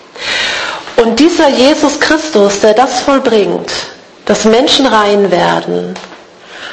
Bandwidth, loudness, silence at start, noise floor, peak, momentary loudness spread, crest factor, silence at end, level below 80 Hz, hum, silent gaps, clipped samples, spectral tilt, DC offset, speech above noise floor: 11 kHz; -10 LUFS; 0.15 s; -33 dBFS; 0 dBFS; 11 LU; 10 dB; 0 s; -44 dBFS; none; none; 0.4%; -3.5 dB/octave; under 0.1%; 24 dB